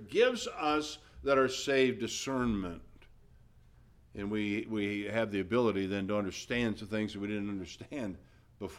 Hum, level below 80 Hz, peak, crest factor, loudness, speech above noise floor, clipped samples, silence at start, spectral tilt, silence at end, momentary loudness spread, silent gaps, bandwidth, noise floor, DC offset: none; -58 dBFS; -16 dBFS; 18 dB; -33 LUFS; 28 dB; under 0.1%; 0 s; -5 dB/octave; 0 s; 13 LU; none; 15 kHz; -60 dBFS; under 0.1%